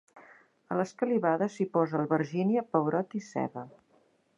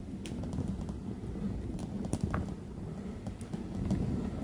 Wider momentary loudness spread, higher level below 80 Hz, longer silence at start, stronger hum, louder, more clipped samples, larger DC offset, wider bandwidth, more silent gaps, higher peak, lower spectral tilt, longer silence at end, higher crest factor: about the same, 8 LU vs 8 LU; second, -80 dBFS vs -44 dBFS; first, 0.15 s vs 0 s; neither; first, -30 LUFS vs -38 LUFS; neither; neither; second, 10 kHz vs 11.5 kHz; neither; first, -10 dBFS vs -16 dBFS; about the same, -8 dB/octave vs -7.5 dB/octave; first, 0.7 s vs 0 s; about the same, 20 dB vs 20 dB